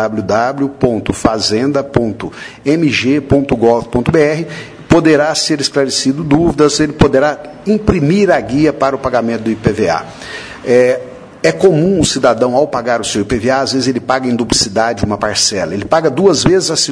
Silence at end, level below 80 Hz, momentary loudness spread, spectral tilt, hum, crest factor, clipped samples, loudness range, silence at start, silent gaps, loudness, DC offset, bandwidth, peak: 0 s; -36 dBFS; 6 LU; -4.5 dB/octave; none; 12 dB; 0.2%; 2 LU; 0 s; none; -13 LUFS; under 0.1%; 11 kHz; 0 dBFS